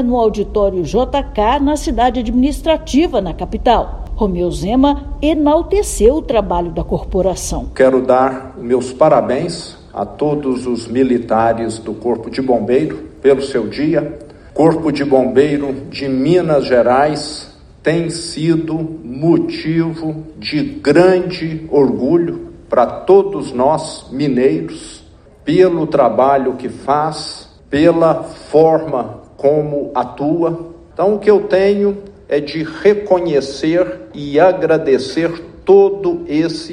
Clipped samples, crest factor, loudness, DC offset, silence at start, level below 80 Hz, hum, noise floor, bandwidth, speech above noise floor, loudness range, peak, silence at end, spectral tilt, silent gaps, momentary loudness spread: under 0.1%; 14 dB; -15 LUFS; under 0.1%; 0 s; -32 dBFS; none; -42 dBFS; 13 kHz; 28 dB; 2 LU; 0 dBFS; 0 s; -6 dB/octave; none; 11 LU